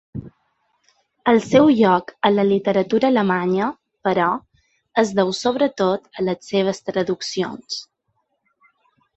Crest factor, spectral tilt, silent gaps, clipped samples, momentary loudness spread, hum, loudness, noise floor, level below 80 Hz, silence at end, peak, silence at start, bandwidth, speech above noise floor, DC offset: 18 dB; -5.5 dB/octave; none; under 0.1%; 11 LU; none; -19 LUFS; -71 dBFS; -58 dBFS; 1.35 s; -2 dBFS; 0.15 s; 8.2 kHz; 53 dB; under 0.1%